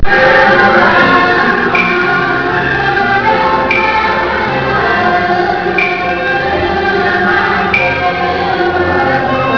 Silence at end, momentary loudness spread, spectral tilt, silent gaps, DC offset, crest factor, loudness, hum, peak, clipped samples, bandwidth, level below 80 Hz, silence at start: 0 s; 6 LU; -6 dB/octave; none; under 0.1%; 10 dB; -10 LUFS; none; 0 dBFS; 0.2%; 5.4 kHz; -32 dBFS; 0 s